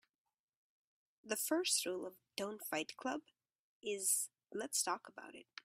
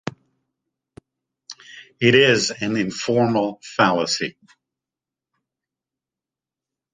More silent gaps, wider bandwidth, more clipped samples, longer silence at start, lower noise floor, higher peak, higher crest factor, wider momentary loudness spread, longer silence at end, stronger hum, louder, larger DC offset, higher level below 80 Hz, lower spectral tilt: first, 3.59-3.81 s vs none; first, 16 kHz vs 9.8 kHz; neither; first, 1.25 s vs 0.05 s; about the same, under -90 dBFS vs -89 dBFS; second, -20 dBFS vs -2 dBFS; about the same, 22 dB vs 22 dB; second, 13 LU vs 24 LU; second, 0.2 s vs 2.65 s; neither; second, -39 LUFS vs -19 LUFS; neither; second, -88 dBFS vs -62 dBFS; second, -1 dB/octave vs -4 dB/octave